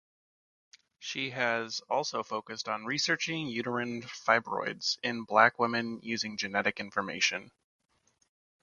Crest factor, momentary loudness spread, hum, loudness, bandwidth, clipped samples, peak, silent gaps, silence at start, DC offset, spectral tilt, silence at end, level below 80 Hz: 26 dB; 10 LU; none; -31 LUFS; 10 kHz; under 0.1%; -6 dBFS; none; 1 s; under 0.1%; -3 dB/octave; 1.15 s; -76 dBFS